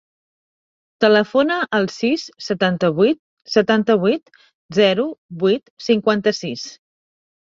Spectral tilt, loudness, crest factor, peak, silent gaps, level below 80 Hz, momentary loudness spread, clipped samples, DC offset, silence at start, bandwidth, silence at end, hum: -5.5 dB/octave; -18 LUFS; 18 dB; -2 dBFS; 3.19-3.37 s, 4.54-4.69 s, 5.18-5.29 s, 5.70-5.77 s; -62 dBFS; 10 LU; under 0.1%; under 0.1%; 1 s; 7.6 kHz; 0.75 s; none